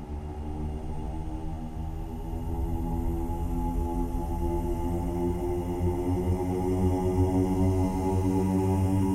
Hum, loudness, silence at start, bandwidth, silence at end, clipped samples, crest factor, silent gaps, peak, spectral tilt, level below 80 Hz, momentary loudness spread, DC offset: none; -29 LUFS; 0 s; 14.5 kHz; 0 s; under 0.1%; 14 dB; none; -14 dBFS; -8.5 dB/octave; -34 dBFS; 11 LU; under 0.1%